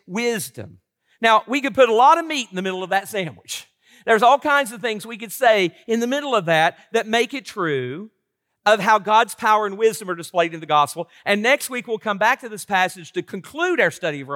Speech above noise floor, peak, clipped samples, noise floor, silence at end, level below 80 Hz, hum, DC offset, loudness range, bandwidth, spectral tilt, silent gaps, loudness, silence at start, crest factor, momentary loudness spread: 49 dB; -2 dBFS; under 0.1%; -69 dBFS; 0 s; -72 dBFS; none; under 0.1%; 2 LU; 17 kHz; -3.5 dB/octave; none; -19 LUFS; 0.1 s; 18 dB; 14 LU